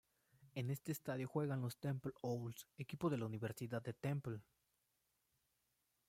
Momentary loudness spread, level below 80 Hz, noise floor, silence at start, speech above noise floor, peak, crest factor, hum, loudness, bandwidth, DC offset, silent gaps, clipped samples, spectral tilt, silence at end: 10 LU; -78 dBFS; -85 dBFS; 0.4 s; 41 dB; -28 dBFS; 18 dB; none; -45 LUFS; 16.5 kHz; under 0.1%; none; under 0.1%; -7 dB/octave; 1.65 s